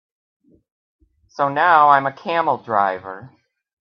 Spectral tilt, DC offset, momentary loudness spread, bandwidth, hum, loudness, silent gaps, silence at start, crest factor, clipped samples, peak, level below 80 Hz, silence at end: -6.5 dB/octave; under 0.1%; 22 LU; 6.4 kHz; none; -17 LUFS; none; 1.4 s; 20 dB; under 0.1%; 0 dBFS; -68 dBFS; 0.7 s